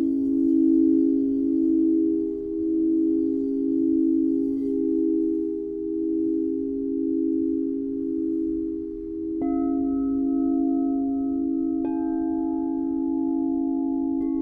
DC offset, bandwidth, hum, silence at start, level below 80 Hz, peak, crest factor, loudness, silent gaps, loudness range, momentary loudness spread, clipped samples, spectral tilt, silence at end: under 0.1%; 2.1 kHz; none; 0 s; -52 dBFS; -12 dBFS; 12 dB; -24 LUFS; none; 4 LU; 7 LU; under 0.1%; -11.5 dB/octave; 0 s